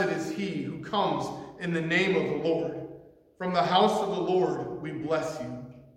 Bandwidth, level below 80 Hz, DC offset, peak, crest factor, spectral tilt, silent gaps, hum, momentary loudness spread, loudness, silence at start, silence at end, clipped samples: 13.5 kHz; -64 dBFS; under 0.1%; -8 dBFS; 20 dB; -5.5 dB/octave; none; none; 13 LU; -28 LUFS; 0 s; 0.1 s; under 0.1%